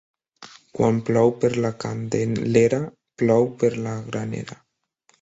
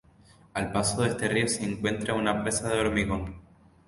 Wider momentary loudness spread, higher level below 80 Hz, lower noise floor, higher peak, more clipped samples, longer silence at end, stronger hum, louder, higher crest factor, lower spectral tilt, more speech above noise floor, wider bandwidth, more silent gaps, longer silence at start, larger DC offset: first, 12 LU vs 8 LU; second, -56 dBFS vs -46 dBFS; first, -65 dBFS vs -57 dBFS; first, -4 dBFS vs -10 dBFS; neither; first, 0.65 s vs 0.45 s; neither; first, -22 LUFS vs -28 LUFS; about the same, 20 dB vs 20 dB; first, -7 dB/octave vs -4 dB/octave; first, 44 dB vs 29 dB; second, 8 kHz vs 12 kHz; neither; second, 0.4 s vs 0.55 s; neither